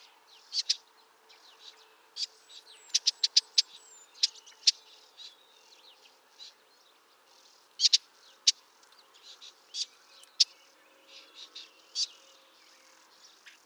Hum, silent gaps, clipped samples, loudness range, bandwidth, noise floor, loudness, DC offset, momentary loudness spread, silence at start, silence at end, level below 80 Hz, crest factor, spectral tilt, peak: none; none; under 0.1%; 6 LU; over 20 kHz; -63 dBFS; -28 LUFS; under 0.1%; 27 LU; 0.5 s; 1.6 s; under -90 dBFS; 28 dB; 6 dB/octave; -8 dBFS